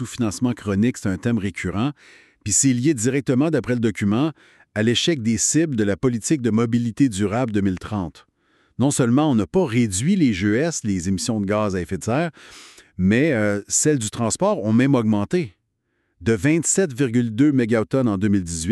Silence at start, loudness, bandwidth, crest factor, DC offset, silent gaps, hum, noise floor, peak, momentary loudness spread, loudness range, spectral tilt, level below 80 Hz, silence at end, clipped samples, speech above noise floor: 0 s; -20 LUFS; 12.5 kHz; 16 dB; under 0.1%; none; none; -71 dBFS; -4 dBFS; 7 LU; 2 LU; -5 dB/octave; -50 dBFS; 0 s; under 0.1%; 51 dB